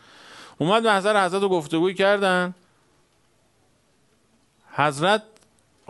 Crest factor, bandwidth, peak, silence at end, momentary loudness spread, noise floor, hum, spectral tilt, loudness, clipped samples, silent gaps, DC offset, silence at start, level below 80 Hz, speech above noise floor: 20 dB; 11.5 kHz; -4 dBFS; 0.65 s; 9 LU; -64 dBFS; none; -5 dB/octave; -21 LUFS; under 0.1%; none; under 0.1%; 0.3 s; -70 dBFS; 43 dB